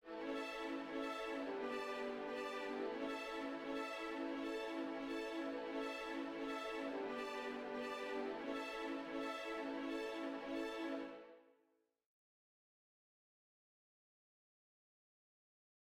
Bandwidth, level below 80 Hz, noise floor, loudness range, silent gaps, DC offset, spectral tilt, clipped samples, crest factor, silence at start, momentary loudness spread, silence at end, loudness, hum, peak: 16 kHz; -76 dBFS; -81 dBFS; 4 LU; none; under 0.1%; -3.5 dB/octave; under 0.1%; 14 dB; 0.05 s; 1 LU; 4.45 s; -45 LUFS; none; -32 dBFS